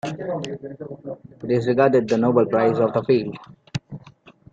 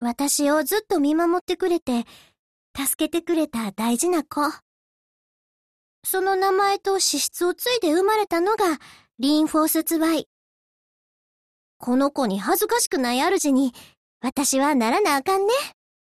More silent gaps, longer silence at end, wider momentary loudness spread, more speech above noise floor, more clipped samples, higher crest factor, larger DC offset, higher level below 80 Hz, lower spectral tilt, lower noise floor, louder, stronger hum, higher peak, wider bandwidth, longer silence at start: second, none vs 1.41-1.47 s, 1.82-1.86 s, 2.39-2.74 s, 2.95-2.99 s, 4.62-6.02 s, 10.26-11.80 s, 12.87-12.91 s, 13.97-14.21 s; about the same, 0.45 s vs 0.35 s; first, 18 LU vs 7 LU; second, 28 dB vs over 68 dB; neither; first, 20 dB vs 14 dB; neither; about the same, -60 dBFS vs -62 dBFS; first, -7.5 dB/octave vs -2.5 dB/octave; second, -49 dBFS vs under -90 dBFS; about the same, -20 LUFS vs -22 LUFS; neither; first, -2 dBFS vs -10 dBFS; second, 7.8 kHz vs 13.5 kHz; about the same, 0.05 s vs 0 s